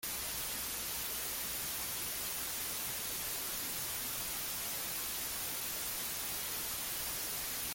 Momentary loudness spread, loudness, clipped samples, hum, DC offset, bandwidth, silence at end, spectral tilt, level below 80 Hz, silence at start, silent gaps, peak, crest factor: 0 LU; -36 LUFS; under 0.1%; none; under 0.1%; 17 kHz; 0 s; -0.5 dB/octave; -60 dBFS; 0 s; none; -24 dBFS; 14 dB